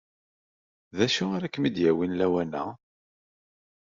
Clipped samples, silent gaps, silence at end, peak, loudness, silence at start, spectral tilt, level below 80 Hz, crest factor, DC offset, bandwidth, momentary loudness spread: under 0.1%; none; 1.15 s; -8 dBFS; -26 LUFS; 0.95 s; -4.5 dB/octave; -66 dBFS; 20 dB; under 0.1%; 7.6 kHz; 10 LU